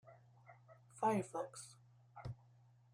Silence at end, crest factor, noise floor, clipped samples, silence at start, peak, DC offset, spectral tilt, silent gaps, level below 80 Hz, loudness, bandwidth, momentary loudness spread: 0.6 s; 20 dB; -68 dBFS; under 0.1%; 0.05 s; -26 dBFS; under 0.1%; -6 dB/octave; none; -74 dBFS; -43 LUFS; 15 kHz; 26 LU